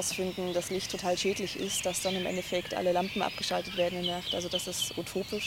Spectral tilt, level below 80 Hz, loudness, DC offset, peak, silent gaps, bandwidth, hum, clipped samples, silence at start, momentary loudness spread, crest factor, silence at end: -3 dB/octave; -60 dBFS; -31 LUFS; under 0.1%; -16 dBFS; none; 16.5 kHz; none; under 0.1%; 0 s; 3 LU; 16 dB; 0 s